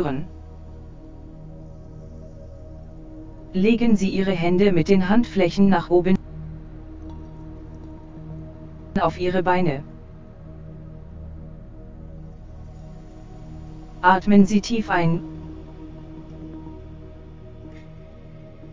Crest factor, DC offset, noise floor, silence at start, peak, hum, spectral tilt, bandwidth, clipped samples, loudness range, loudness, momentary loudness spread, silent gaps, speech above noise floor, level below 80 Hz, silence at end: 22 dB; under 0.1%; -41 dBFS; 0 s; -2 dBFS; none; -7 dB/octave; 7.6 kHz; under 0.1%; 21 LU; -20 LUFS; 24 LU; none; 23 dB; -42 dBFS; 0 s